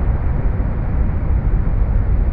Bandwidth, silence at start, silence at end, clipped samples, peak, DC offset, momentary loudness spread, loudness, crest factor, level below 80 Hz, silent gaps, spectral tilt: 2.8 kHz; 0 s; 0 s; under 0.1%; -6 dBFS; under 0.1%; 2 LU; -20 LUFS; 10 dB; -16 dBFS; none; -12.5 dB/octave